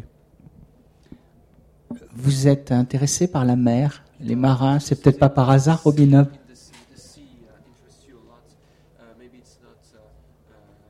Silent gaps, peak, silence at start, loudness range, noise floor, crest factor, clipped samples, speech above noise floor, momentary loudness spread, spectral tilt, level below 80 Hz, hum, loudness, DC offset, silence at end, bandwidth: none; -2 dBFS; 1.9 s; 6 LU; -55 dBFS; 20 dB; under 0.1%; 38 dB; 11 LU; -7 dB/octave; -50 dBFS; none; -18 LUFS; under 0.1%; 4.55 s; 12.5 kHz